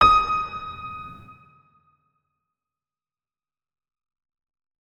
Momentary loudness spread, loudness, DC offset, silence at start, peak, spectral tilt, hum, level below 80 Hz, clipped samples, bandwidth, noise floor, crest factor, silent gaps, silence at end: 23 LU; -23 LUFS; under 0.1%; 0 s; -4 dBFS; -4 dB/octave; none; -46 dBFS; under 0.1%; 9.8 kHz; under -90 dBFS; 24 dB; none; 3.5 s